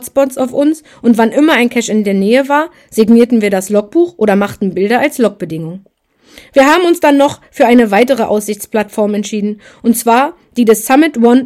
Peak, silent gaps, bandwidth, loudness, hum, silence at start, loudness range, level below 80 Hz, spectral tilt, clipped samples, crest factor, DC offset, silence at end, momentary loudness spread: 0 dBFS; none; 15.5 kHz; -11 LUFS; none; 0 s; 2 LU; -52 dBFS; -5 dB/octave; 0.9%; 12 dB; under 0.1%; 0 s; 8 LU